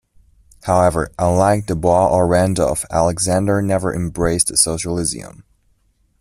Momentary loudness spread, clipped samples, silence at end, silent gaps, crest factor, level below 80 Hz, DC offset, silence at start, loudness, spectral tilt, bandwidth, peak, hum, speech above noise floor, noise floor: 6 LU; under 0.1%; 0.8 s; none; 18 dB; -38 dBFS; under 0.1%; 0.65 s; -17 LUFS; -4.5 dB/octave; 14.5 kHz; 0 dBFS; none; 44 dB; -60 dBFS